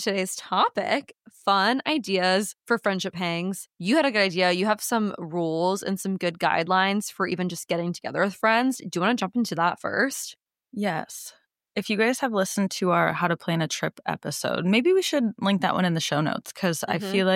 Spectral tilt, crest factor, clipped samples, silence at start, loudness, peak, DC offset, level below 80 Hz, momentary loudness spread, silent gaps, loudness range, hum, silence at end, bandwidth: -4.5 dB/octave; 18 dB; under 0.1%; 0 s; -25 LUFS; -8 dBFS; under 0.1%; -74 dBFS; 8 LU; none; 3 LU; none; 0 s; 17 kHz